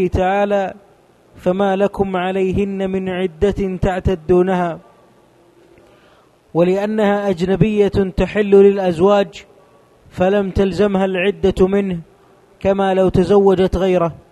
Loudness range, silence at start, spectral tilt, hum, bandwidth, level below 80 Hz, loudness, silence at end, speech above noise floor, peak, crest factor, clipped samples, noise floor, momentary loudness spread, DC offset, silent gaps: 5 LU; 0 s; -7.5 dB/octave; none; 9.8 kHz; -34 dBFS; -16 LUFS; 0.1 s; 35 dB; 0 dBFS; 16 dB; under 0.1%; -51 dBFS; 8 LU; under 0.1%; none